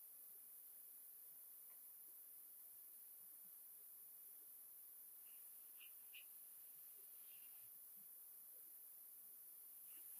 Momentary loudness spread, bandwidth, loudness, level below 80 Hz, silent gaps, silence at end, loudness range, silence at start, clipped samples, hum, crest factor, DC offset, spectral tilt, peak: 1 LU; 15.5 kHz; -58 LUFS; under -90 dBFS; none; 0 s; 0 LU; 0 s; under 0.1%; none; 16 dB; under 0.1%; 1 dB/octave; -46 dBFS